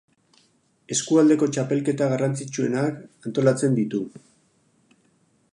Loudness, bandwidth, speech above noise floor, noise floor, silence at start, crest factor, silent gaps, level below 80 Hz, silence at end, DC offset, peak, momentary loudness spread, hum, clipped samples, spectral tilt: -23 LUFS; 11 kHz; 42 dB; -64 dBFS; 0.9 s; 18 dB; none; -70 dBFS; 1.35 s; under 0.1%; -6 dBFS; 11 LU; none; under 0.1%; -5.5 dB/octave